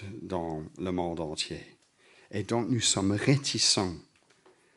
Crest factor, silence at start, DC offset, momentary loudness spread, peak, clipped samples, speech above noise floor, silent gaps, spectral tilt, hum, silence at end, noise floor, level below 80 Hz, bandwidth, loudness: 22 dB; 0 s; under 0.1%; 14 LU; -8 dBFS; under 0.1%; 33 dB; none; -3.5 dB/octave; none; 0.75 s; -63 dBFS; -60 dBFS; 11.5 kHz; -29 LUFS